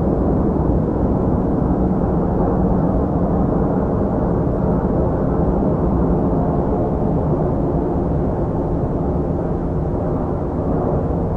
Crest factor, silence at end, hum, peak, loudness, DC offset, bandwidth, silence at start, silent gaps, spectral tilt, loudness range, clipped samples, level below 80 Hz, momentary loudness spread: 14 dB; 0 s; none; -4 dBFS; -19 LUFS; under 0.1%; 3.7 kHz; 0 s; none; -12 dB/octave; 2 LU; under 0.1%; -26 dBFS; 3 LU